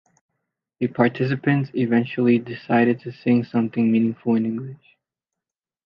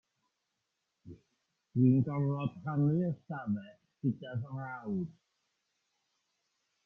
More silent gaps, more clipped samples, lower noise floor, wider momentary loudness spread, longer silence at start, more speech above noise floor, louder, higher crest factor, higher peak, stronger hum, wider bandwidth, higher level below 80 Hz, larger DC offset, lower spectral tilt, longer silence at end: neither; neither; first, -88 dBFS vs -84 dBFS; second, 8 LU vs 13 LU; second, 0.8 s vs 1.05 s; first, 68 dB vs 52 dB; first, -21 LUFS vs -34 LUFS; about the same, 18 dB vs 20 dB; first, -4 dBFS vs -16 dBFS; neither; first, 5.4 kHz vs 3.5 kHz; first, -66 dBFS vs -72 dBFS; neither; about the same, -10 dB/octave vs -11 dB/octave; second, 1.1 s vs 1.75 s